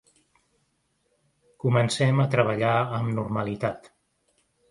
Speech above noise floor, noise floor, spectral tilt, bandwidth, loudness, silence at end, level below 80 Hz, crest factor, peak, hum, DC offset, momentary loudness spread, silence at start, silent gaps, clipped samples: 48 dB; -72 dBFS; -6.5 dB/octave; 11.5 kHz; -25 LUFS; 0.85 s; -60 dBFS; 20 dB; -6 dBFS; none; under 0.1%; 8 LU; 1.65 s; none; under 0.1%